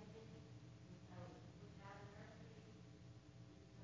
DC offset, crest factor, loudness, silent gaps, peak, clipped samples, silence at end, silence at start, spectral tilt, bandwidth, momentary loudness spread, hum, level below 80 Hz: under 0.1%; 16 dB; -60 LUFS; none; -44 dBFS; under 0.1%; 0 s; 0 s; -6.5 dB/octave; 7.6 kHz; 4 LU; none; -72 dBFS